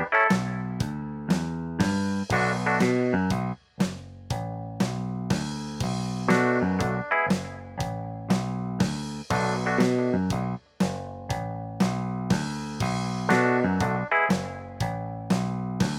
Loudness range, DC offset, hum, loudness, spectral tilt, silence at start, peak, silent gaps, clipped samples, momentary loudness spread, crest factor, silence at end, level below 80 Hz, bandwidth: 2 LU; under 0.1%; none; -27 LUFS; -6 dB/octave; 0 s; -8 dBFS; none; under 0.1%; 10 LU; 18 dB; 0 s; -50 dBFS; 14.5 kHz